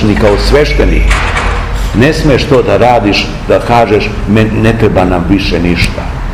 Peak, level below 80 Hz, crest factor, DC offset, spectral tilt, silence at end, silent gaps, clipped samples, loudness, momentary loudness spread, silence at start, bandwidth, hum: 0 dBFS; -16 dBFS; 8 dB; 0.7%; -6 dB/octave; 0 s; none; 4%; -9 LUFS; 5 LU; 0 s; 14 kHz; none